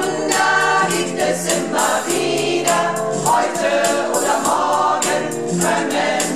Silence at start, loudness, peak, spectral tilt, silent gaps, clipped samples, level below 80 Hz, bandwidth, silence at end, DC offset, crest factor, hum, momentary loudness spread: 0 s; -17 LUFS; -4 dBFS; -3 dB/octave; none; under 0.1%; -58 dBFS; 16 kHz; 0 s; 0.6%; 14 dB; none; 4 LU